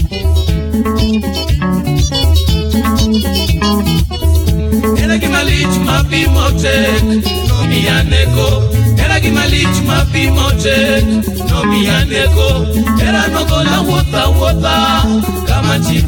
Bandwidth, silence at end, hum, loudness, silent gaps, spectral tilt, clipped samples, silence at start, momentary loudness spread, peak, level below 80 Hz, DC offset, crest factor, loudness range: 19.5 kHz; 0 s; none; -12 LUFS; none; -5.5 dB/octave; under 0.1%; 0 s; 3 LU; 0 dBFS; -16 dBFS; under 0.1%; 10 dB; 1 LU